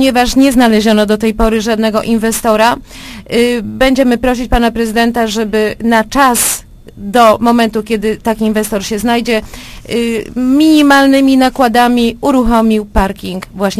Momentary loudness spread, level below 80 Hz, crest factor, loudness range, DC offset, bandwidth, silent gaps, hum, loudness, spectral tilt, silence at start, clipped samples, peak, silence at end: 9 LU; -28 dBFS; 10 dB; 3 LU; under 0.1%; 15.5 kHz; none; none; -11 LUFS; -4 dB/octave; 0 s; 0.5%; 0 dBFS; 0 s